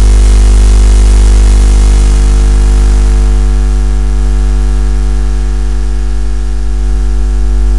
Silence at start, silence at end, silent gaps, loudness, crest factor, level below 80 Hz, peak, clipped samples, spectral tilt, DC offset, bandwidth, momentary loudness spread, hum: 0 s; 0 s; none; -10 LUFS; 8 dB; -6 dBFS; 0 dBFS; 0.2%; -6 dB/octave; 20%; 11 kHz; 7 LU; none